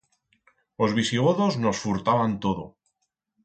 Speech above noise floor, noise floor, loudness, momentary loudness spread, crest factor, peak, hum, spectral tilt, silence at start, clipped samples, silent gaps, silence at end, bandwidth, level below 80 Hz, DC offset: 54 dB; -78 dBFS; -24 LUFS; 7 LU; 18 dB; -8 dBFS; none; -5.5 dB/octave; 0.8 s; under 0.1%; none; 0.75 s; 9 kHz; -56 dBFS; under 0.1%